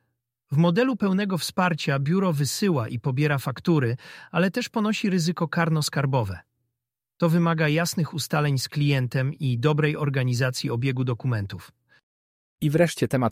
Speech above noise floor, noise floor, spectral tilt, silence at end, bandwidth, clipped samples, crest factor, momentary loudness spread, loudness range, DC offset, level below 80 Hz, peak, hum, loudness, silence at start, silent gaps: 62 dB; -85 dBFS; -6 dB/octave; 0 s; 16 kHz; under 0.1%; 18 dB; 6 LU; 2 LU; under 0.1%; -60 dBFS; -6 dBFS; none; -24 LUFS; 0.5 s; 12.03-12.58 s